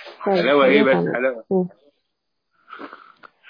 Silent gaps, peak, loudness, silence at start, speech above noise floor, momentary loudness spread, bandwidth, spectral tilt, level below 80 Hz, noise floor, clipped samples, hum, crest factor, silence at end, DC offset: none; -2 dBFS; -18 LUFS; 0 s; 60 dB; 24 LU; 5.2 kHz; -8.5 dB/octave; -70 dBFS; -77 dBFS; under 0.1%; none; 18 dB; 0.25 s; under 0.1%